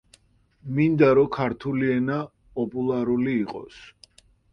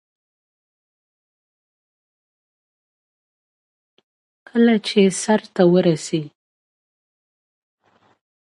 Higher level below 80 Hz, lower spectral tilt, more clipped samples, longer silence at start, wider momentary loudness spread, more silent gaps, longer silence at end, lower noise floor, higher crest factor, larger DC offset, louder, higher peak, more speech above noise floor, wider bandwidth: first, -56 dBFS vs -70 dBFS; first, -9 dB/octave vs -5.5 dB/octave; neither; second, 0.65 s vs 4.55 s; first, 16 LU vs 11 LU; neither; second, 0.6 s vs 2.2 s; second, -60 dBFS vs under -90 dBFS; about the same, 20 dB vs 20 dB; neither; second, -23 LUFS vs -18 LUFS; about the same, -4 dBFS vs -2 dBFS; second, 37 dB vs over 73 dB; second, 9.2 kHz vs 11.5 kHz